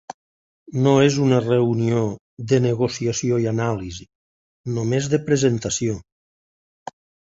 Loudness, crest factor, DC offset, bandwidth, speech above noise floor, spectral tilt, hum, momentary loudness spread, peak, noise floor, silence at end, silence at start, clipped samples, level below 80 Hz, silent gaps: -20 LUFS; 18 dB; under 0.1%; 8 kHz; over 71 dB; -6 dB/octave; none; 20 LU; -2 dBFS; under -90 dBFS; 1.2 s; 0.1 s; under 0.1%; -52 dBFS; 0.14-0.66 s, 2.19-2.37 s, 4.15-4.64 s